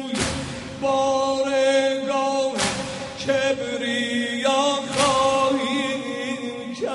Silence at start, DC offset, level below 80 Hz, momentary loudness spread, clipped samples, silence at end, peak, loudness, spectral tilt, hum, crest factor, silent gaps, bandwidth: 0 s; under 0.1%; -50 dBFS; 10 LU; under 0.1%; 0 s; -6 dBFS; -22 LUFS; -3.5 dB/octave; none; 16 dB; none; 11.5 kHz